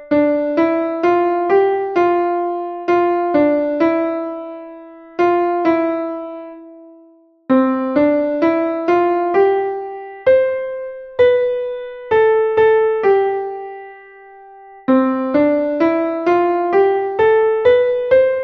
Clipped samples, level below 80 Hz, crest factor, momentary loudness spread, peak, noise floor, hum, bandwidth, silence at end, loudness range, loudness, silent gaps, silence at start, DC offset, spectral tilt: under 0.1%; -56 dBFS; 14 dB; 13 LU; -2 dBFS; -49 dBFS; none; 6.2 kHz; 0 s; 3 LU; -16 LUFS; none; 0 s; under 0.1%; -7.5 dB/octave